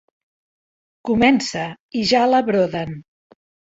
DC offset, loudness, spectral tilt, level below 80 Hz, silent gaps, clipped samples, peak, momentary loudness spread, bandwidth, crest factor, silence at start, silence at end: under 0.1%; -18 LUFS; -5 dB/octave; -52 dBFS; 1.80-1.89 s; under 0.1%; -2 dBFS; 15 LU; 8 kHz; 20 dB; 1.05 s; 0.75 s